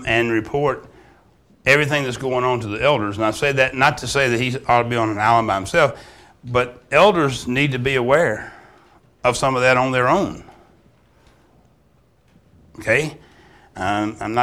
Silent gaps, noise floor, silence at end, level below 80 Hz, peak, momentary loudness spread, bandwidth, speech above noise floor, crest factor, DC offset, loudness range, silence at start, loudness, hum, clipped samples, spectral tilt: none; -57 dBFS; 0 s; -46 dBFS; -2 dBFS; 8 LU; 16 kHz; 39 dB; 18 dB; under 0.1%; 8 LU; 0 s; -18 LUFS; none; under 0.1%; -5 dB/octave